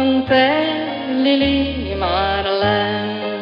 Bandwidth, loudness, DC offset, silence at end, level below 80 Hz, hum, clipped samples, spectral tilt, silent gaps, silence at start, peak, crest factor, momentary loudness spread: 5.6 kHz; -17 LUFS; under 0.1%; 0 s; -36 dBFS; none; under 0.1%; -7.5 dB/octave; none; 0 s; -2 dBFS; 14 dB; 7 LU